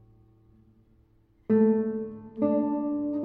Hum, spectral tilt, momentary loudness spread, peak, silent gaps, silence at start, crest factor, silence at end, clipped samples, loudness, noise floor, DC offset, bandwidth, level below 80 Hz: none; -12.5 dB/octave; 14 LU; -12 dBFS; none; 1.5 s; 16 dB; 0 s; under 0.1%; -27 LUFS; -62 dBFS; under 0.1%; 2.8 kHz; -64 dBFS